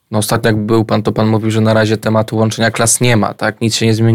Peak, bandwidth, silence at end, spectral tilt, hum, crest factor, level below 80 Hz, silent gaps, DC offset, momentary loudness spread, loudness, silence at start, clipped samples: 0 dBFS; 16 kHz; 0 s; -5 dB/octave; none; 12 dB; -44 dBFS; none; under 0.1%; 4 LU; -13 LUFS; 0.1 s; under 0.1%